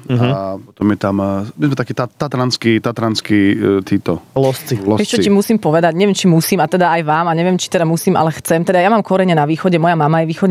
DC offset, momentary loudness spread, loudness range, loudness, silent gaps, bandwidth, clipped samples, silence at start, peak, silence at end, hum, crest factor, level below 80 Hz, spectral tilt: under 0.1%; 6 LU; 3 LU; -14 LUFS; none; 15.5 kHz; under 0.1%; 0.1 s; -2 dBFS; 0 s; none; 12 dB; -56 dBFS; -6 dB/octave